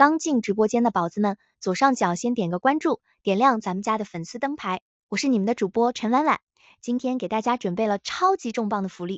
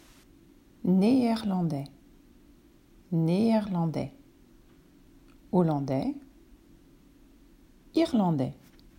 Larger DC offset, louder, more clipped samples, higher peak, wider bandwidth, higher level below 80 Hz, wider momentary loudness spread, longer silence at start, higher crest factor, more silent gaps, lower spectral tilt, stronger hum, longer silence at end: neither; first, -24 LUFS vs -28 LUFS; neither; first, -4 dBFS vs -12 dBFS; second, 8.2 kHz vs 16 kHz; second, -68 dBFS vs -60 dBFS; second, 9 LU vs 12 LU; second, 0 s vs 0.85 s; about the same, 20 dB vs 18 dB; first, 4.82-5.09 s, 6.43-6.47 s vs none; second, -5 dB/octave vs -8.5 dB/octave; neither; second, 0 s vs 0.45 s